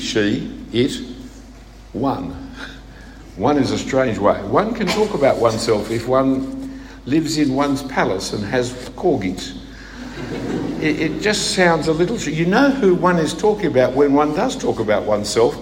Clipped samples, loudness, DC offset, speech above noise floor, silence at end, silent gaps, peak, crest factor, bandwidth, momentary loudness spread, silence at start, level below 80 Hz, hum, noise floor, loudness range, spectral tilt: under 0.1%; -18 LUFS; under 0.1%; 22 dB; 0 s; none; 0 dBFS; 18 dB; 16.5 kHz; 17 LU; 0 s; -40 dBFS; none; -39 dBFS; 6 LU; -5 dB/octave